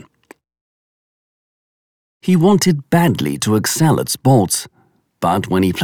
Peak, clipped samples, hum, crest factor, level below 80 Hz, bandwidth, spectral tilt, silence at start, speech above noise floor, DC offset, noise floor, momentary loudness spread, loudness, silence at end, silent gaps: -2 dBFS; under 0.1%; none; 14 dB; -52 dBFS; over 20 kHz; -5.5 dB/octave; 2.25 s; 34 dB; under 0.1%; -48 dBFS; 7 LU; -15 LUFS; 0 s; none